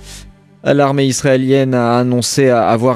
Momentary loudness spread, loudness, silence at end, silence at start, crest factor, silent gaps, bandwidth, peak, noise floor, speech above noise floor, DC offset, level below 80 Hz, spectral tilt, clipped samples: 2 LU; -13 LUFS; 0 s; 0 s; 14 dB; none; 15.5 kHz; 0 dBFS; -38 dBFS; 26 dB; under 0.1%; -46 dBFS; -5.5 dB/octave; under 0.1%